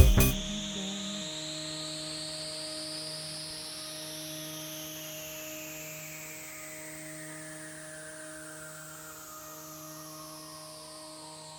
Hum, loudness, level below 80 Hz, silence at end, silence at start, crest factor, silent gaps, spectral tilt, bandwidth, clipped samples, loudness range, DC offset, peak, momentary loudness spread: none; -37 LUFS; -40 dBFS; 0 s; 0 s; 30 dB; none; -3.5 dB/octave; over 20 kHz; under 0.1%; 7 LU; under 0.1%; -6 dBFS; 9 LU